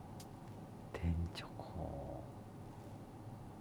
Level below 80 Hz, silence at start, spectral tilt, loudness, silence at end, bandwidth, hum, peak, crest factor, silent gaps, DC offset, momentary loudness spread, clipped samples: -54 dBFS; 0 s; -7 dB/octave; -47 LUFS; 0 s; 19.5 kHz; none; -26 dBFS; 20 dB; none; under 0.1%; 12 LU; under 0.1%